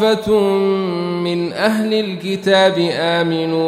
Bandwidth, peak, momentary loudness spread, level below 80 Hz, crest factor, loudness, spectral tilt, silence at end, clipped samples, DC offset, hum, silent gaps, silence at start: 15 kHz; -2 dBFS; 7 LU; -54 dBFS; 14 dB; -16 LUFS; -5.5 dB/octave; 0 s; under 0.1%; under 0.1%; none; none; 0 s